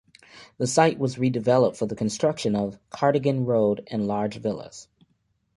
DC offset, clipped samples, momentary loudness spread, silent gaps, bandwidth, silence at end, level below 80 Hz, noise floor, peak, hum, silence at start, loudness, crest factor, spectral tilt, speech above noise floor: under 0.1%; under 0.1%; 10 LU; none; 11.5 kHz; 0.75 s; -60 dBFS; -70 dBFS; -4 dBFS; none; 0.35 s; -24 LUFS; 20 dB; -6 dB/octave; 47 dB